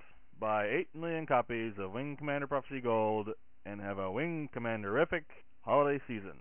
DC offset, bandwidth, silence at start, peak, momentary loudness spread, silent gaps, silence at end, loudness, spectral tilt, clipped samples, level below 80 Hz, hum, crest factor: 0.3%; 3.5 kHz; 0.4 s; -16 dBFS; 10 LU; none; 0.05 s; -35 LUFS; -5 dB/octave; under 0.1%; -64 dBFS; none; 18 dB